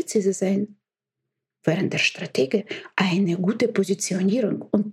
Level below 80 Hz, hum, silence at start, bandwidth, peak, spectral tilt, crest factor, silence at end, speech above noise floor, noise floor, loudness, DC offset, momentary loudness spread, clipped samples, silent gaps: -72 dBFS; none; 0 s; 13.5 kHz; -6 dBFS; -5 dB/octave; 18 dB; 0 s; 62 dB; -84 dBFS; -23 LUFS; under 0.1%; 5 LU; under 0.1%; none